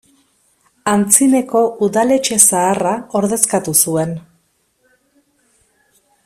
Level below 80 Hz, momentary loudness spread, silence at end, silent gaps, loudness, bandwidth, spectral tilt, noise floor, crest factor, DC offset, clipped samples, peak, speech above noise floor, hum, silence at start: -58 dBFS; 9 LU; 2.05 s; none; -13 LUFS; 16 kHz; -3.5 dB/octave; -61 dBFS; 16 dB; under 0.1%; under 0.1%; 0 dBFS; 47 dB; none; 0.85 s